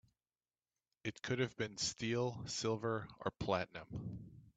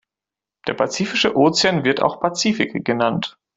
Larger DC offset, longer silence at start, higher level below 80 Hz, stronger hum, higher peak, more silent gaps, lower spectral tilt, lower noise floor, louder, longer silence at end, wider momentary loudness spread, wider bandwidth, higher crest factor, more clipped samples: neither; first, 1.05 s vs 0.65 s; second, -66 dBFS vs -58 dBFS; neither; second, -20 dBFS vs -2 dBFS; neither; about the same, -4.5 dB/octave vs -4 dB/octave; about the same, under -90 dBFS vs -88 dBFS; second, -41 LUFS vs -19 LUFS; second, 0.05 s vs 0.25 s; about the same, 9 LU vs 8 LU; about the same, 9 kHz vs 8.2 kHz; about the same, 22 dB vs 18 dB; neither